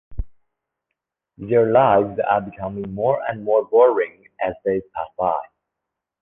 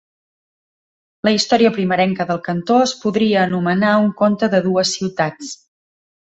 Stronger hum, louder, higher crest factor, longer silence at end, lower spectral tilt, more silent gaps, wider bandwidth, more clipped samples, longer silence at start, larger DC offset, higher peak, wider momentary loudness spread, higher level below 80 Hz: neither; second, -20 LUFS vs -17 LUFS; about the same, 18 dB vs 16 dB; about the same, 0.75 s vs 0.85 s; first, -10 dB/octave vs -5 dB/octave; neither; second, 3.7 kHz vs 8.2 kHz; neither; second, 0.1 s vs 1.25 s; neither; about the same, -2 dBFS vs -2 dBFS; first, 15 LU vs 7 LU; first, -42 dBFS vs -58 dBFS